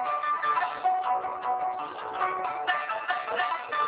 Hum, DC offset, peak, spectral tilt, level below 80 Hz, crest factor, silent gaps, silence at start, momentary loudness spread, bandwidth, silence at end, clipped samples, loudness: none; under 0.1%; -14 dBFS; 1 dB/octave; -72 dBFS; 16 dB; none; 0 s; 4 LU; 4 kHz; 0 s; under 0.1%; -29 LUFS